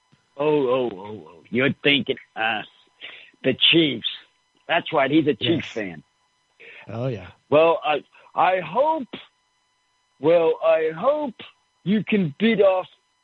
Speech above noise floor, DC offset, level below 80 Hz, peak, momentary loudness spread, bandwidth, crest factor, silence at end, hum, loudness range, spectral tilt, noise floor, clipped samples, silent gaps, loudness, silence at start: 47 dB; under 0.1%; -66 dBFS; -4 dBFS; 19 LU; 7.4 kHz; 18 dB; 0.35 s; none; 3 LU; -7 dB/octave; -68 dBFS; under 0.1%; none; -21 LUFS; 0.35 s